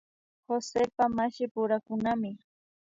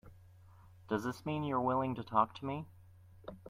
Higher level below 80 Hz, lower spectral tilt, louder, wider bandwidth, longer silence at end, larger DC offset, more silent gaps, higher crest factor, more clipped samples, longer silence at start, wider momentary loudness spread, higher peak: about the same, -66 dBFS vs -66 dBFS; second, -5.5 dB/octave vs -7.5 dB/octave; first, -30 LUFS vs -36 LUFS; second, 7.8 kHz vs 16 kHz; first, 0.5 s vs 0 s; neither; first, 1.51-1.55 s vs none; second, 18 dB vs 24 dB; neither; first, 0.5 s vs 0.05 s; second, 7 LU vs 18 LU; about the same, -14 dBFS vs -14 dBFS